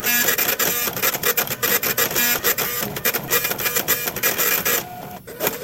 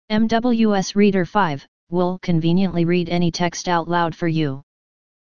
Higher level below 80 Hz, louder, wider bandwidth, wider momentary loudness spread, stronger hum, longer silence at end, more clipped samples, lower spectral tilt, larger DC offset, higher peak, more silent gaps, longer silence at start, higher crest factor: about the same, -52 dBFS vs -48 dBFS; about the same, -18 LUFS vs -20 LUFS; first, 17 kHz vs 7.2 kHz; about the same, 6 LU vs 6 LU; neither; second, 0 s vs 0.7 s; neither; second, -1 dB/octave vs -6 dB/octave; second, under 0.1% vs 3%; about the same, -2 dBFS vs -4 dBFS; second, none vs 1.68-1.87 s; about the same, 0 s vs 0.1 s; about the same, 20 dB vs 16 dB